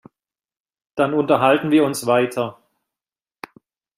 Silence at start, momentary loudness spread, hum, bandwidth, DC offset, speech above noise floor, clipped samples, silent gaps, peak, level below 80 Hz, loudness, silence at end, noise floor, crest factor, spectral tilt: 0.95 s; 24 LU; none; 15.5 kHz; under 0.1%; over 73 dB; under 0.1%; none; -2 dBFS; -64 dBFS; -18 LUFS; 1.45 s; under -90 dBFS; 18 dB; -5.5 dB/octave